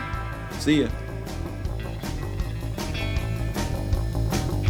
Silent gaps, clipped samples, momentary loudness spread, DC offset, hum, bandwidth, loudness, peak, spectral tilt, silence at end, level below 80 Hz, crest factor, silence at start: none; under 0.1%; 9 LU; under 0.1%; none; 19 kHz; -28 LUFS; -8 dBFS; -6 dB/octave; 0 s; -32 dBFS; 18 dB; 0 s